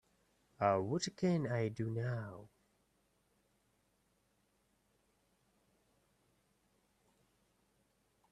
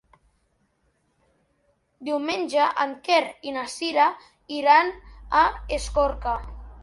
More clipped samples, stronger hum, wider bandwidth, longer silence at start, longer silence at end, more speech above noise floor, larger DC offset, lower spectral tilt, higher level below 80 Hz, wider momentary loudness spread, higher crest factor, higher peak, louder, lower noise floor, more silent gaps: neither; neither; about the same, 11 kHz vs 11.5 kHz; second, 0.6 s vs 2 s; first, 5.85 s vs 0 s; second, 41 dB vs 46 dB; neither; first, -6 dB/octave vs -3.5 dB/octave; second, -76 dBFS vs -42 dBFS; second, 10 LU vs 14 LU; first, 26 dB vs 20 dB; second, -18 dBFS vs -6 dBFS; second, -37 LUFS vs -23 LUFS; first, -78 dBFS vs -69 dBFS; neither